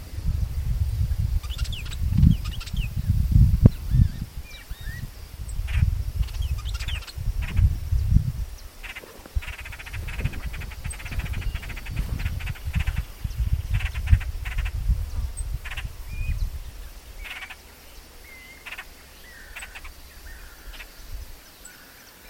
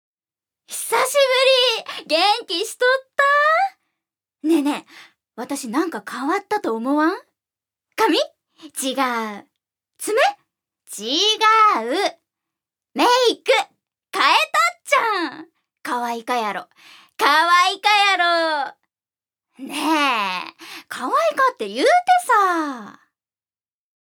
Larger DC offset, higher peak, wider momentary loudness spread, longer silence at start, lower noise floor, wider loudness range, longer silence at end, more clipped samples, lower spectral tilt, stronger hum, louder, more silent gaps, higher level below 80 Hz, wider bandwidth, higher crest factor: neither; about the same, 0 dBFS vs 0 dBFS; first, 20 LU vs 16 LU; second, 0 s vs 0.7 s; second, -47 dBFS vs under -90 dBFS; first, 17 LU vs 5 LU; second, 0 s vs 1.25 s; neither; first, -6 dB/octave vs -1 dB/octave; neither; second, -27 LUFS vs -18 LUFS; neither; first, -28 dBFS vs -86 dBFS; second, 17 kHz vs over 20 kHz; first, 26 dB vs 20 dB